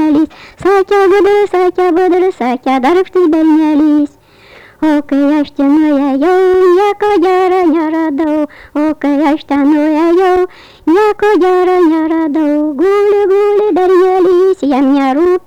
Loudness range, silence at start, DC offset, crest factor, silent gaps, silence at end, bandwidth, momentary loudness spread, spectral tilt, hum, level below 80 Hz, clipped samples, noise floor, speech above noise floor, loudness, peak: 2 LU; 0 s; under 0.1%; 6 dB; none; 0.1 s; 10 kHz; 5 LU; -5.5 dB/octave; none; -46 dBFS; under 0.1%; -39 dBFS; 30 dB; -10 LUFS; -4 dBFS